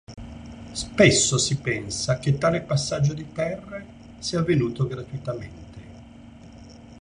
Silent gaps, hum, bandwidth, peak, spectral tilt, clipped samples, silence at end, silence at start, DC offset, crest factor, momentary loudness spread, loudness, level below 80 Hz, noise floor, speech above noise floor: none; none; 10.5 kHz; -2 dBFS; -4.5 dB/octave; under 0.1%; 0 s; 0.1 s; under 0.1%; 22 dB; 23 LU; -23 LUFS; -48 dBFS; -45 dBFS; 22 dB